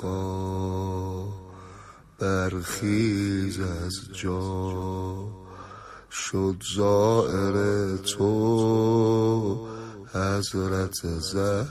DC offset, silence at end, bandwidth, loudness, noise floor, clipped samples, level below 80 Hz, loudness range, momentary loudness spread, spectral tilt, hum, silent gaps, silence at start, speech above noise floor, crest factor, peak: under 0.1%; 0 s; 15.5 kHz; -26 LUFS; -47 dBFS; under 0.1%; -44 dBFS; 7 LU; 16 LU; -6 dB/octave; none; none; 0 s; 23 dB; 18 dB; -8 dBFS